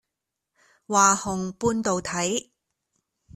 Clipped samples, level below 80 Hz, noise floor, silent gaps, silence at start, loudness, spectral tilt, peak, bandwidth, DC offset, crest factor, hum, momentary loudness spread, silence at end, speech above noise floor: under 0.1%; -58 dBFS; -84 dBFS; none; 0.9 s; -23 LUFS; -3.5 dB/octave; -4 dBFS; 14 kHz; under 0.1%; 22 dB; none; 9 LU; 0.95 s; 61 dB